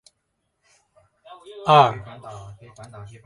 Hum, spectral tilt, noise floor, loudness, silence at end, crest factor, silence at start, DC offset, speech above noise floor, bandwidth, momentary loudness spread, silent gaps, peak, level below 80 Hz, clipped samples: none; -6 dB/octave; -74 dBFS; -17 LUFS; 0.2 s; 24 dB; 1.6 s; under 0.1%; 54 dB; 11.5 kHz; 28 LU; none; 0 dBFS; -60 dBFS; under 0.1%